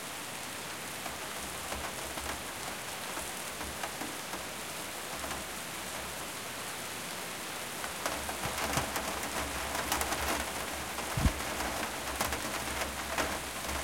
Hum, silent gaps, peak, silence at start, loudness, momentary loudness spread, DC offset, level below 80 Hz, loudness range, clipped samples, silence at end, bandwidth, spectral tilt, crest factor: none; none; -12 dBFS; 0 s; -35 LUFS; 6 LU; 0.1%; -48 dBFS; 4 LU; under 0.1%; 0 s; 17 kHz; -2.5 dB/octave; 26 dB